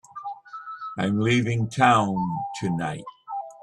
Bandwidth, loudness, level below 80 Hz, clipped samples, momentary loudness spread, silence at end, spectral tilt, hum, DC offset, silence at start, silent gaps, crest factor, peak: 11.5 kHz; -24 LUFS; -60 dBFS; under 0.1%; 18 LU; 0 s; -6 dB/octave; none; under 0.1%; 0.15 s; none; 20 dB; -4 dBFS